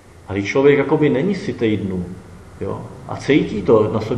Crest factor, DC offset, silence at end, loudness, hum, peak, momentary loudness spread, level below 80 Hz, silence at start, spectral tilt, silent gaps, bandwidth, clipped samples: 18 dB; under 0.1%; 0 s; -18 LUFS; none; 0 dBFS; 16 LU; -48 dBFS; 0.3 s; -7 dB/octave; none; 11 kHz; under 0.1%